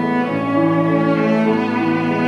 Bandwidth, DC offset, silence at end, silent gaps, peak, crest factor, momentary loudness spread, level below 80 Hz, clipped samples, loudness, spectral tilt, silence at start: 8.2 kHz; under 0.1%; 0 s; none; -4 dBFS; 12 dB; 3 LU; -60 dBFS; under 0.1%; -17 LUFS; -8 dB/octave; 0 s